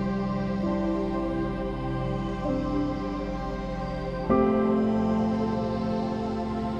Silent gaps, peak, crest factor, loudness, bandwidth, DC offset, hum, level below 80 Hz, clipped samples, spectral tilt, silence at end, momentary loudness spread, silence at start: none; -10 dBFS; 18 dB; -28 LUFS; 7.8 kHz; under 0.1%; none; -40 dBFS; under 0.1%; -8.5 dB/octave; 0 s; 8 LU; 0 s